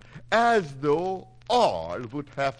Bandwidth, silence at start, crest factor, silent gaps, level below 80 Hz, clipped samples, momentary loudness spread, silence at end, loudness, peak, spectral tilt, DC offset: 10.5 kHz; 0.15 s; 18 dB; none; -56 dBFS; under 0.1%; 12 LU; 0.05 s; -25 LUFS; -8 dBFS; -5 dB/octave; under 0.1%